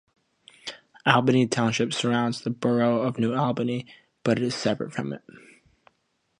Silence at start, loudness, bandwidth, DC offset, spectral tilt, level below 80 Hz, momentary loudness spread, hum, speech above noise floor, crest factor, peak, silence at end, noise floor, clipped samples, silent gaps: 0.65 s; -25 LUFS; 10.5 kHz; under 0.1%; -5.5 dB/octave; -66 dBFS; 18 LU; none; 48 dB; 22 dB; -4 dBFS; 1 s; -73 dBFS; under 0.1%; none